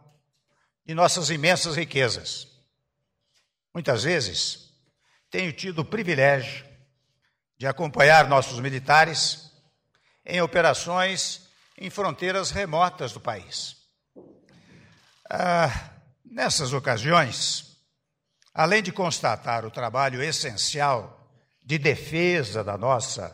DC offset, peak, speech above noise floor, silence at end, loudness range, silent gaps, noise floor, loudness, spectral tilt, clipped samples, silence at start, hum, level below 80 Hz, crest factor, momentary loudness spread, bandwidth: under 0.1%; -4 dBFS; 54 dB; 0 s; 8 LU; none; -78 dBFS; -23 LUFS; -3.5 dB/octave; under 0.1%; 0.9 s; none; -56 dBFS; 20 dB; 13 LU; 16 kHz